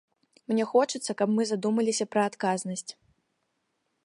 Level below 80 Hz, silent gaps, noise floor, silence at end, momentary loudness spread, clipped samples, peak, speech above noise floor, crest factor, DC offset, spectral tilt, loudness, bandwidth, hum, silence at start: -80 dBFS; none; -77 dBFS; 1.1 s; 11 LU; under 0.1%; -10 dBFS; 50 dB; 20 dB; under 0.1%; -4.5 dB/octave; -27 LUFS; 11.5 kHz; none; 0.5 s